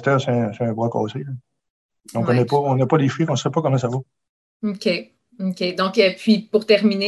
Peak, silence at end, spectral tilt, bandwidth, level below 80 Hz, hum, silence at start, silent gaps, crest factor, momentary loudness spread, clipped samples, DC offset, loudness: -2 dBFS; 0 s; -6.5 dB/octave; 12 kHz; -62 dBFS; none; 0 s; 1.70-1.89 s, 4.29-4.60 s; 18 dB; 11 LU; under 0.1%; under 0.1%; -20 LUFS